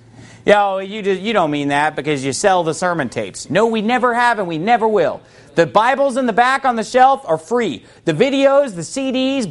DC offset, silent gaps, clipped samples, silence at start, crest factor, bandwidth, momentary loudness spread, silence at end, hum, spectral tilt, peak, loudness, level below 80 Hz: under 0.1%; none; under 0.1%; 0.2 s; 16 dB; 11.5 kHz; 9 LU; 0 s; none; -4.5 dB/octave; 0 dBFS; -16 LUFS; -54 dBFS